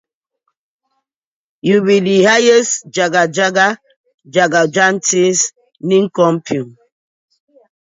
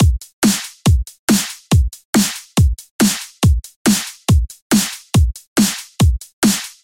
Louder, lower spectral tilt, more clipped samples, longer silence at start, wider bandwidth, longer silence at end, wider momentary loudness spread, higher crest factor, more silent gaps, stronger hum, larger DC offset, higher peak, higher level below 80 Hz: first, -13 LUFS vs -17 LUFS; about the same, -3.5 dB/octave vs -4.5 dB/octave; neither; first, 1.65 s vs 0 s; second, 8 kHz vs 17 kHz; first, 1.2 s vs 0.15 s; first, 11 LU vs 1 LU; about the same, 16 dB vs 14 dB; second, 3.96-4.04 s, 4.14-4.18 s vs 0.33-0.42 s, 1.19-1.28 s, 2.05-2.13 s, 2.91-2.99 s, 3.76-3.85 s, 4.62-4.70 s, 5.47-5.56 s, 6.33-6.42 s; neither; neither; about the same, 0 dBFS vs -2 dBFS; second, -64 dBFS vs -22 dBFS